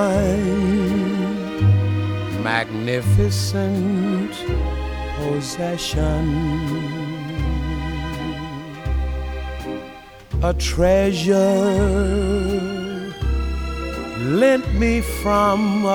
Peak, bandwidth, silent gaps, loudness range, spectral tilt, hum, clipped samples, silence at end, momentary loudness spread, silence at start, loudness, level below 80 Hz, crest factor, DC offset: -4 dBFS; 18.5 kHz; none; 7 LU; -6.5 dB/octave; none; under 0.1%; 0 s; 11 LU; 0 s; -21 LUFS; -28 dBFS; 16 dB; under 0.1%